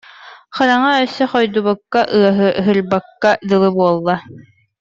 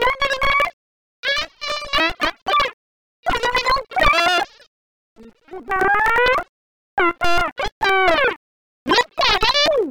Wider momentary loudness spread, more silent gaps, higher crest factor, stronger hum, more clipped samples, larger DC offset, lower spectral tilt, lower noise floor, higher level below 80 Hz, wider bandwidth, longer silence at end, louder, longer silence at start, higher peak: second, 5 LU vs 11 LU; second, none vs 0.73-1.23 s, 2.73-3.23 s, 4.67-5.16 s, 6.49-6.97 s, 7.52-7.56 s, 7.72-7.81 s, 8.36-8.86 s; about the same, 14 dB vs 14 dB; neither; neither; neither; first, -6.5 dB/octave vs -2.5 dB/octave; about the same, -40 dBFS vs -38 dBFS; second, -56 dBFS vs -36 dBFS; second, 7.6 kHz vs 19.5 kHz; first, 0.4 s vs 0 s; first, -15 LUFS vs -18 LUFS; first, 0.2 s vs 0 s; first, -2 dBFS vs -6 dBFS